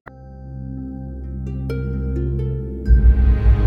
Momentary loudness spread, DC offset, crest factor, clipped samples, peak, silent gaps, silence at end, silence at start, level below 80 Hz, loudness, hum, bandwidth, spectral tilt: 18 LU; under 0.1%; 16 dB; under 0.1%; -2 dBFS; none; 0 s; 0.05 s; -18 dBFS; -21 LUFS; none; 3.3 kHz; -10.5 dB/octave